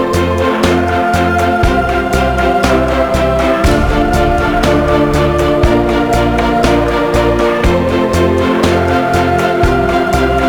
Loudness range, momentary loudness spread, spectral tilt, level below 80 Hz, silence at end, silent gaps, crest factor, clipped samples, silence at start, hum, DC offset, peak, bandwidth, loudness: 0 LU; 1 LU; -6 dB/octave; -20 dBFS; 0 s; none; 10 dB; under 0.1%; 0 s; none; under 0.1%; 0 dBFS; 20 kHz; -12 LUFS